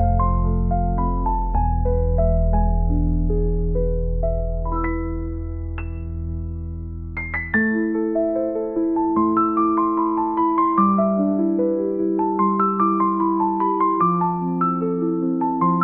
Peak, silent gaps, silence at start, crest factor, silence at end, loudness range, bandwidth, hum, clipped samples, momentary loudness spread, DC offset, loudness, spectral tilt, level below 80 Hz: -6 dBFS; none; 0 s; 14 dB; 0 s; 6 LU; 2.9 kHz; none; under 0.1%; 11 LU; 0.2%; -21 LUFS; -13.5 dB/octave; -26 dBFS